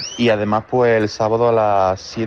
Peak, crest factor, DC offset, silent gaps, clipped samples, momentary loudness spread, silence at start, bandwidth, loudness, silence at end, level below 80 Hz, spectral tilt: -6 dBFS; 10 dB; under 0.1%; none; under 0.1%; 3 LU; 0 s; 7.4 kHz; -17 LUFS; 0 s; -50 dBFS; -5.5 dB/octave